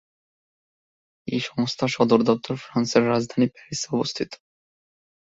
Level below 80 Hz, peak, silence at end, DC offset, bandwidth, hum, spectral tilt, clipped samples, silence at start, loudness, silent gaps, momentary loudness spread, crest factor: -62 dBFS; -2 dBFS; 0.85 s; under 0.1%; 7.8 kHz; none; -5 dB/octave; under 0.1%; 1.25 s; -23 LUFS; none; 12 LU; 22 dB